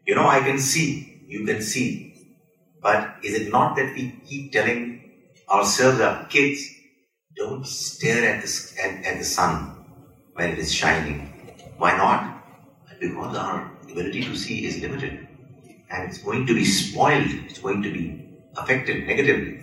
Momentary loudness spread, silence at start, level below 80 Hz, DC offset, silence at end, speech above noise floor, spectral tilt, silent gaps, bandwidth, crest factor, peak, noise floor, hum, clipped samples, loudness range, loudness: 15 LU; 0.05 s; -50 dBFS; under 0.1%; 0 s; 38 dB; -3.5 dB/octave; none; 16.5 kHz; 20 dB; -4 dBFS; -61 dBFS; none; under 0.1%; 5 LU; -23 LUFS